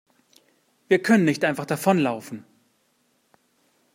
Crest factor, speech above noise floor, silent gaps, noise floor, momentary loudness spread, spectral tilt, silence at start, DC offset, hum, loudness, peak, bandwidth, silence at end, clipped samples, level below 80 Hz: 20 dB; 46 dB; none; -67 dBFS; 17 LU; -6 dB/octave; 0.9 s; under 0.1%; none; -22 LUFS; -4 dBFS; 16 kHz; 1.55 s; under 0.1%; -72 dBFS